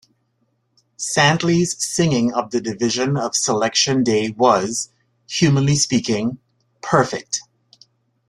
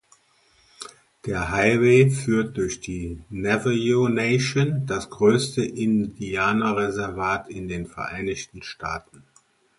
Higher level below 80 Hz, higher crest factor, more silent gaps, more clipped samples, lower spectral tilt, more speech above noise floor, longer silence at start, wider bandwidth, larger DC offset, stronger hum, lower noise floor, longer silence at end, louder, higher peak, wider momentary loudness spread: second, -54 dBFS vs -48 dBFS; about the same, 18 dB vs 18 dB; neither; neither; second, -4 dB/octave vs -6 dB/octave; first, 49 dB vs 38 dB; first, 1 s vs 0.8 s; first, 13 kHz vs 11.5 kHz; neither; neither; first, -67 dBFS vs -61 dBFS; about the same, 0.85 s vs 0.8 s; first, -18 LUFS vs -23 LUFS; about the same, -2 dBFS vs -4 dBFS; second, 11 LU vs 14 LU